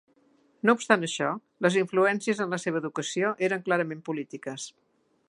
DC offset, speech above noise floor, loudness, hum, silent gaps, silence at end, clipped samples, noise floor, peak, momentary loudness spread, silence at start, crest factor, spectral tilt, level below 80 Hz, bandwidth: under 0.1%; 37 dB; -27 LUFS; none; none; 0.6 s; under 0.1%; -64 dBFS; -4 dBFS; 12 LU; 0.65 s; 24 dB; -4.5 dB/octave; -80 dBFS; 11.5 kHz